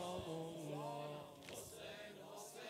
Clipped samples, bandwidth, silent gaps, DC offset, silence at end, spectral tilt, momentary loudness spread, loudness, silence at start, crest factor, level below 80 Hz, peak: under 0.1%; 16 kHz; none; under 0.1%; 0 s; -4.5 dB/octave; 7 LU; -50 LUFS; 0 s; 14 dB; -74 dBFS; -34 dBFS